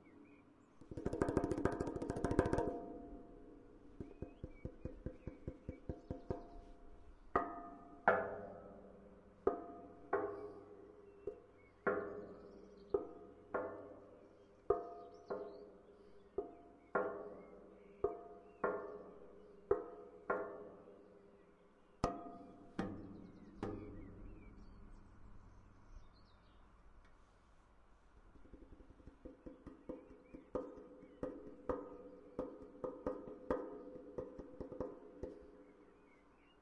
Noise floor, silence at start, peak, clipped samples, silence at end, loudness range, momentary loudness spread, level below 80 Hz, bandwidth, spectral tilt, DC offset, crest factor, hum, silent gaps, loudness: -68 dBFS; 0 s; -16 dBFS; under 0.1%; 0 s; 17 LU; 22 LU; -60 dBFS; 10.5 kHz; -7.5 dB/octave; under 0.1%; 30 dB; none; none; -45 LUFS